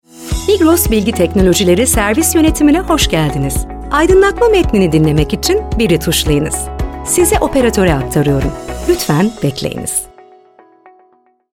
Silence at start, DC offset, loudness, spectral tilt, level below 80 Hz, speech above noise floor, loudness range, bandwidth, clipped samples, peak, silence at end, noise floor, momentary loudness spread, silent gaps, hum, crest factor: 0.15 s; 0.5%; -12 LUFS; -4.5 dB/octave; -24 dBFS; 41 dB; 4 LU; 18 kHz; under 0.1%; 0 dBFS; 1.45 s; -52 dBFS; 9 LU; none; none; 12 dB